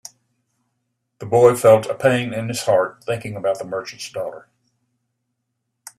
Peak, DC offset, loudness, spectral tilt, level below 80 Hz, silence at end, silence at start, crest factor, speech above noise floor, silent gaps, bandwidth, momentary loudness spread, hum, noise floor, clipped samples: 0 dBFS; under 0.1%; -19 LUFS; -5 dB/octave; -62 dBFS; 1.6 s; 1.2 s; 20 dB; 58 dB; none; 14 kHz; 15 LU; none; -76 dBFS; under 0.1%